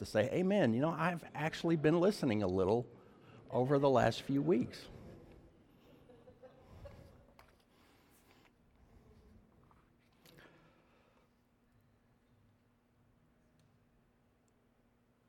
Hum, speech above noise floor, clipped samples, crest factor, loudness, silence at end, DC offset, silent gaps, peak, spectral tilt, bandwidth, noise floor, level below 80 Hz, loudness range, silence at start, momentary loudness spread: none; 40 dB; under 0.1%; 22 dB; -34 LUFS; 8.35 s; under 0.1%; none; -18 dBFS; -7 dB/octave; 16 kHz; -73 dBFS; -68 dBFS; 8 LU; 0 s; 25 LU